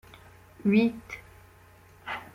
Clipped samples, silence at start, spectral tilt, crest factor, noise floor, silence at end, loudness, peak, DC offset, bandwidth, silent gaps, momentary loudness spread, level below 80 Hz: under 0.1%; 0.6 s; -7.5 dB/octave; 20 dB; -55 dBFS; 0.1 s; -27 LUFS; -10 dBFS; under 0.1%; 14.5 kHz; none; 20 LU; -60 dBFS